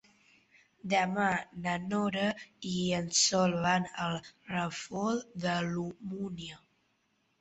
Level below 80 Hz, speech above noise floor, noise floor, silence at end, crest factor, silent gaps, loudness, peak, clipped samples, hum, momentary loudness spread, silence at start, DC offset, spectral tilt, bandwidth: -66 dBFS; 43 dB; -75 dBFS; 0.85 s; 20 dB; none; -32 LUFS; -14 dBFS; under 0.1%; none; 13 LU; 0.85 s; under 0.1%; -3.5 dB/octave; 8.2 kHz